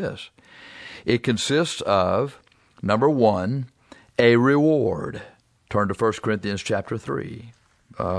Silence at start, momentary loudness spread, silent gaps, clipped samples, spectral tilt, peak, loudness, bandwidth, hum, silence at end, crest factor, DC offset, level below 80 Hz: 0 s; 21 LU; none; under 0.1%; -6 dB/octave; -4 dBFS; -22 LUFS; 11 kHz; none; 0 s; 18 dB; under 0.1%; -56 dBFS